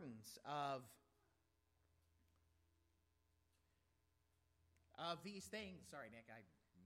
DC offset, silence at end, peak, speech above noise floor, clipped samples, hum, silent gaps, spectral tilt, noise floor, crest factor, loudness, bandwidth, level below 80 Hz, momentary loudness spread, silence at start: under 0.1%; 0 s; -34 dBFS; 32 dB; under 0.1%; none; none; -4 dB/octave; -84 dBFS; 22 dB; -52 LUFS; 16 kHz; -84 dBFS; 17 LU; 0 s